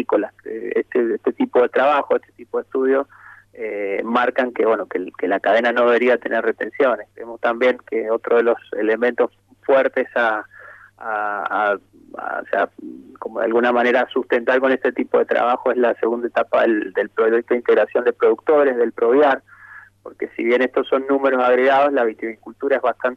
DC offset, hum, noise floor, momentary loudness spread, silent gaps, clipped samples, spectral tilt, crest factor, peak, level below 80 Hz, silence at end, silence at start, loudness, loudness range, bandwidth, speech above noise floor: under 0.1%; none; -43 dBFS; 12 LU; none; under 0.1%; -6 dB/octave; 14 dB; -6 dBFS; -68 dBFS; 0 s; 0 s; -19 LUFS; 4 LU; 6.6 kHz; 25 dB